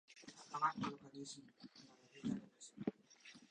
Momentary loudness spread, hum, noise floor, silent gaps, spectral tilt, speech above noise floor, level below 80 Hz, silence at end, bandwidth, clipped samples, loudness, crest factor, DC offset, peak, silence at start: 20 LU; none; -64 dBFS; none; -4.5 dB/octave; 18 dB; -82 dBFS; 0.05 s; 10 kHz; under 0.1%; -46 LUFS; 22 dB; under 0.1%; -26 dBFS; 0.1 s